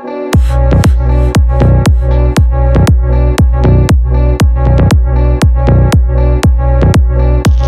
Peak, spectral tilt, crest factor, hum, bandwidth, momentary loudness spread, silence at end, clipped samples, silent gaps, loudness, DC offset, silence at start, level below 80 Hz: 0 dBFS; -7 dB/octave; 6 dB; none; 12.5 kHz; 2 LU; 0 s; under 0.1%; none; -9 LUFS; under 0.1%; 0 s; -10 dBFS